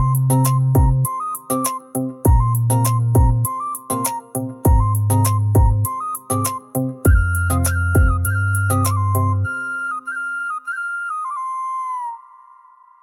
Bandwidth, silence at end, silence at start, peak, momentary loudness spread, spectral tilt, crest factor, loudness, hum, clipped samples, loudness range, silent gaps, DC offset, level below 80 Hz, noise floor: 18 kHz; 0.85 s; 0 s; -4 dBFS; 9 LU; -6 dB/octave; 14 dB; -19 LUFS; none; under 0.1%; 5 LU; none; under 0.1%; -26 dBFS; -48 dBFS